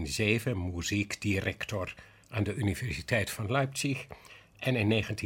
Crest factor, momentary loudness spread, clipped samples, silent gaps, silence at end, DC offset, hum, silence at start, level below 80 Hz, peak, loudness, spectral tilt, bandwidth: 20 dB; 10 LU; under 0.1%; none; 0 s; under 0.1%; none; 0 s; -54 dBFS; -12 dBFS; -31 LUFS; -5 dB/octave; 17 kHz